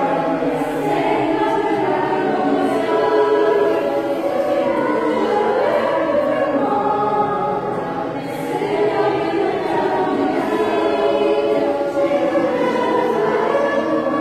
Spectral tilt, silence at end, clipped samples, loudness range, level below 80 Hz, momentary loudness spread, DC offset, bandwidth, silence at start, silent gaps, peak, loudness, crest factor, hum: -6 dB/octave; 0 s; under 0.1%; 2 LU; -54 dBFS; 4 LU; under 0.1%; 14 kHz; 0 s; none; -6 dBFS; -18 LUFS; 12 dB; none